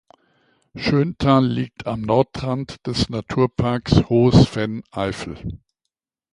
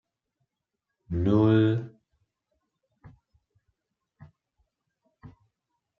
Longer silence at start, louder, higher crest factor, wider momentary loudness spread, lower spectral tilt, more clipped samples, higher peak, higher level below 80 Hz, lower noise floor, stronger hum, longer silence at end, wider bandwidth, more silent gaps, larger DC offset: second, 0.75 s vs 1.1 s; first, -20 LUFS vs -24 LUFS; about the same, 20 dB vs 20 dB; about the same, 12 LU vs 14 LU; second, -7 dB/octave vs -10 dB/octave; neither; first, 0 dBFS vs -10 dBFS; first, -38 dBFS vs -56 dBFS; second, -81 dBFS vs -85 dBFS; neither; about the same, 0.75 s vs 0.7 s; first, 11 kHz vs 5.6 kHz; neither; neither